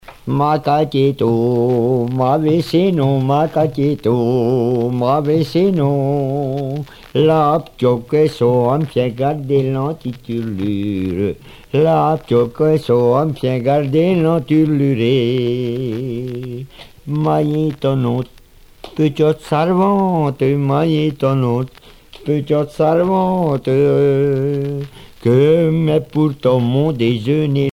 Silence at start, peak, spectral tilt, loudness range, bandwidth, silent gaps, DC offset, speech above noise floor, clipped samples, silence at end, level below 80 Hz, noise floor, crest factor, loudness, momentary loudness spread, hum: 0.1 s; -2 dBFS; -8.5 dB/octave; 3 LU; 15.5 kHz; none; under 0.1%; 28 dB; under 0.1%; 0 s; -46 dBFS; -44 dBFS; 14 dB; -16 LUFS; 9 LU; none